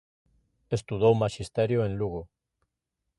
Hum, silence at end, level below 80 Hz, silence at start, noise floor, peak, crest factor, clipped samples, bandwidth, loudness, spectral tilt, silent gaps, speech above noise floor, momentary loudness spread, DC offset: none; 0.95 s; -52 dBFS; 0.7 s; -84 dBFS; -10 dBFS; 20 dB; under 0.1%; 11.5 kHz; -27 LUFS; -7 dB/octave; none; 57 dB; 10 LU; under 0.1%